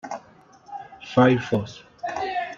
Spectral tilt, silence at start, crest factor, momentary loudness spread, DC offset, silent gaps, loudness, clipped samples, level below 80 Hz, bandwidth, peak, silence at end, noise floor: -7 dB/octave; 0.05 s; 20 dB; 21 LU; under 0.1%; none; -23 LUFS; under 0.1%; -60 dBFS; 7.4 kHz; -4 dBFS; 0 s; -52 dBFS